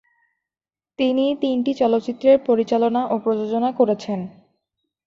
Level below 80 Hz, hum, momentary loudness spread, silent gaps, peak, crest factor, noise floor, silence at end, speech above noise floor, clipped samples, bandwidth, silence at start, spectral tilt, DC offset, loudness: -64 dBFS; none; 7 LU; none; -4 dBFS; 16 dB; under -90 dBFS; 0.75 s; over 71 dB; under 0.1%; 7.6 kHz; 1 s; -7 dB/octave; under 0.1%; -20 LUFS